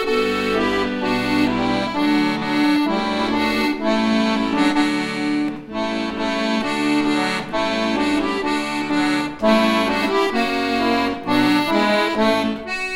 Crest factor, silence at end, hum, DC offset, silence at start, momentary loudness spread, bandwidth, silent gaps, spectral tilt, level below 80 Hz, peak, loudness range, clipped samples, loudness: 14 dB; 0 s; none; under 0.1%; 0 s; 5 LU; 16 kHz; none; -4.5 dB/octave; -46 dBFS; -4 dBFS; 2 LU; under 0.1%; -19 LUFS